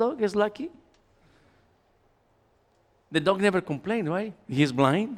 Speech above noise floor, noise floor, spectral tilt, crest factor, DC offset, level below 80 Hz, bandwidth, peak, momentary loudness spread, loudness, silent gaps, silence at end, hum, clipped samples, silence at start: 40 dB; -66 dBFS; -6.5 dB/octave; 22 dB; under 0.1%; -64 dBFS; 14 kHz; -6 dBFS; 9 LU; -26 LUFS; none; 0 s; none; under 0.1%; 0 s